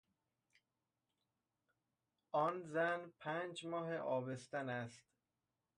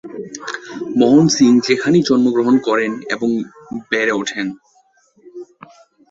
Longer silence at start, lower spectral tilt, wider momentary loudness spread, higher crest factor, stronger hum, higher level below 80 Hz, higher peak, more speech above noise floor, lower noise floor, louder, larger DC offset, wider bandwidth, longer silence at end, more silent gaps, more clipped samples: first, 2.35 s vs 0.05 s; about the same, -5.5 dB/octave vs -5 dB/octave; second, 6 LU vs 18 LU; about the same, 20 dB vs 16 dB; neither; second, -88 dBFS vs -58 dBFS; second, -26 dBFS vs -2 dBFS; first, over 48 dB vs 42 dB; first, under -90 dBFS vs -56 dBFS; second, -42 LUFS vs -15 LUFS; neither; first, 11 kHz vs 8 kHz; about the same, 0.75 s vs 0.65 s; neither; neither